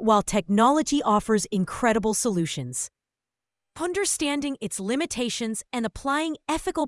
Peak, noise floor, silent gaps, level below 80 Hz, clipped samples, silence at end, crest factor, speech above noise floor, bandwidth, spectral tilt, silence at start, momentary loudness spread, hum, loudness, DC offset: -6 dBFS; -89 dBFS; none; -50 dBFS; under 0.1%; 0 s; 18 dB; 64 dB; 12 kHz; -4 dB/octave; 0 s; 9 LU; none; -25 LUFS; under 0.1%